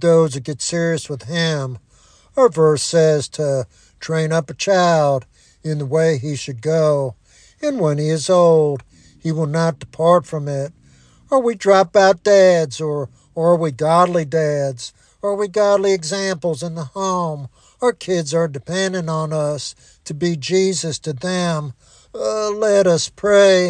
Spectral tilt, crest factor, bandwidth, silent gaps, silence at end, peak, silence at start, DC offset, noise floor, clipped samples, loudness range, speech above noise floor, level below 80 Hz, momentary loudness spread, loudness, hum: -5 dB/octave; 16 dB; 10.5 kHz; none; 0 s; -2 dBFS; 0 s; under 0.1%; -51 dBFS; under 0.1%; 6 LU; 34 dB; -56 dBFS; 13 LU; -18 LUFS; none